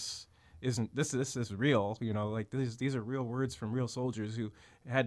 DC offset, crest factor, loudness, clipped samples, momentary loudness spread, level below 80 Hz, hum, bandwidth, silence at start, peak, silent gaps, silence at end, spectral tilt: under 0.1%; 18 dB; -35 LUFS; under 0.1%; 10 LU; -66 dBFS; none; 11 kHz; 0 s; -16 dBFS; none; 0 s; -5.5 dB/octave